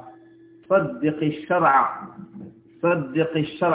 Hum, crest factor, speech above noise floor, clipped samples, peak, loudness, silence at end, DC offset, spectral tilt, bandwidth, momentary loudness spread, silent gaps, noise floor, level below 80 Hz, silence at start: none; 18 dB; 28 dB; under 0.1%; -6 dBFS; -22 LUFS; 0 s; under 0.1%; -10.5 dB/octave; 4 kHz; 22 LU; none; -50 dBFS; -62 dBFS; 0 s